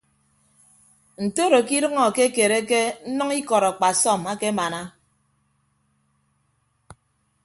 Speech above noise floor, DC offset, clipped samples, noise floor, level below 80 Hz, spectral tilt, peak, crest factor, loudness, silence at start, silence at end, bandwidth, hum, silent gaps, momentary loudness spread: 47 dB; under 0.1%; under 0.1%; -68 dBFS; -66 dBFS; -3 dB/octave; -4 dBFS; 20 dB; -21 LUFS; 1.2 s; 0.5 s; 12 kHz; none; none; 9 LU